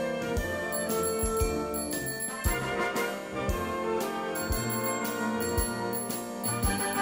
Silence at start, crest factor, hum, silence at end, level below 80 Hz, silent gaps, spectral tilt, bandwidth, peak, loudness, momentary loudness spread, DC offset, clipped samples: 0 s; 16 dB; none; 0 s; -40 dBFS; none; -4 dB/octave; 16.5 kHz; -14 dBFS; -30 LUFS; 4 LU; under 0.1%; under 0.1%